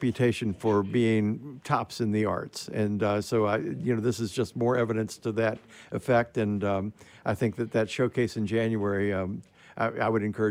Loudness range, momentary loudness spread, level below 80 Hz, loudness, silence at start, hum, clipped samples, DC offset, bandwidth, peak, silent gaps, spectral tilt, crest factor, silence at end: 1 LU; 8 LU; -64 dBFS; -28 LUFS; 0 s; none; under 0.1%; under 0.1%; 16 kHz; -10 dBFS; none; -6.5 dB/octave; 18 dB; 0 s